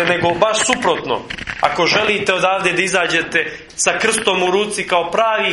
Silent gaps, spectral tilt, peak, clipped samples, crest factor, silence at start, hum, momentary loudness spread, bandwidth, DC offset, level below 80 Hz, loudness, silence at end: none; -2.5 dB/octave; 0 dBFS; under 0.1%; 16 dB; 0 s; none; 5 LU; 11.5 kHz; under 0.1%; -48 dBFS; -16 LUFS; 0 s